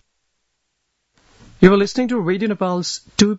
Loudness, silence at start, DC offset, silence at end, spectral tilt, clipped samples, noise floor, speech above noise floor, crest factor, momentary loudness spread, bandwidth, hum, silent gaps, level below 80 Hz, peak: -17 LUFS; 1.6 s; under 0.1%; 0 s; -5.5 dB/octave; under 0.1%; -72 dBFS; 56 dB; 20 dB; 9 LU; 8 kHz; none; none; -48 dBFS; 0 dBFS